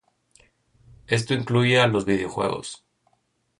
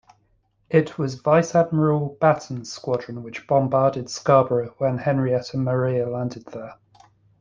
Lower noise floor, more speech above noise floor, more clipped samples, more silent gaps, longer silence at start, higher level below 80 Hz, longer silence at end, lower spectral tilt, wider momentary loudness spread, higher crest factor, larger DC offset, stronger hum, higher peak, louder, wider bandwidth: first, -70 dBFS vs -65 dBFS; first, 48 dB vs 44 dB; neither; neither; first, 1.1 s vs 0.7 s; about the same, -56 dBFS vs -58 dBFS; first, 0.85 s vs 0.65 s; second, -5.5 dB/octave vs -7 dB/octave; about the same, 15 LU vs 14 LU; about the same, 20 dB vs 20 dB; neither; neither; second, -6 dBFS vs -2 dBFS; about the same, -22 LUFS vs -22 LUFS; first, 11 kHz vs 7.6 kHz